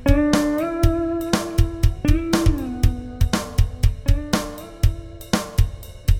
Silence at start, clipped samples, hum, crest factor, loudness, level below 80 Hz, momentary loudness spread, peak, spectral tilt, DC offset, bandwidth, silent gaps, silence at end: 0 s; under 0.1%; none; 18 dB; -22 LUFS; -22 dBFS; 6 LU; -2 dBFS; -6 dB/octave; 0.3%; 17 kHz; none; 0 s